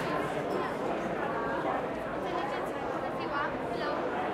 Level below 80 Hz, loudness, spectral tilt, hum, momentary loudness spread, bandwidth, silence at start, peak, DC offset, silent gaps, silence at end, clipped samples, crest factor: -58 dBFS; -33 LUFS; -6 dB/octave; none; 2 LU; 16 kHz; 0 s; -18 dBFS; under 0.1%; none; 0 s; under 0.1%; 14 dB